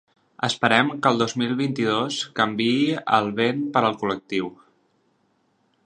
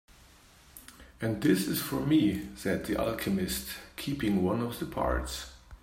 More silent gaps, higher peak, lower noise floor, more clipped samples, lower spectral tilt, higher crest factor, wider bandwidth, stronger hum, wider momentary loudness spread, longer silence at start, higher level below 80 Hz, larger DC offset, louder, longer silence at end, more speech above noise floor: neither; first, 0 dBFS vs -14 dBFS; first, -67 dBFS vs -57 dBFS; neither; about the same, -4.5 dB/octave vs -5.5 dB/octave; first, 24 dB vs 18 dB; second, 10.5 kHz vs 16.5 kHz; neither; second, 9 LU vs 14 LU; second, 0.4 s vs 0.75 s; second, -66 dBFS vs -46 dBFS; neither; first, -22 LUFS vs -31 LUFS; first, 1.3 s vs 0.05 s; first, 44 dB vs 27 dB